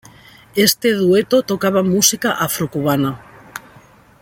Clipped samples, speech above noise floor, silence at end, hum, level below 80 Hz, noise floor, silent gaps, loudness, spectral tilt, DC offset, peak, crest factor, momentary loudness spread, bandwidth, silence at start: under 0.1%; 31 dB; 0.65 s; none; -54 dBFS; -46 dBFS; none; -16 LUFS; -3.5 dB/octave; under 0.1%; 0 dBFS; 18 dB; 21 LU; 17 kHz; 0.55 s